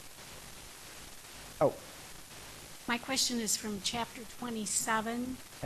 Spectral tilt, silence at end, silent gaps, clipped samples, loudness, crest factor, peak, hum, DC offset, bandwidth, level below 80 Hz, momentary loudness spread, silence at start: -2 dB/octave; 0 s; none; under 0.1%; -33 LUFS; 22 dB; -16 dBFS; none; under 0.1%; 13 kHz; -60 dBFS; 17 LU; 0 s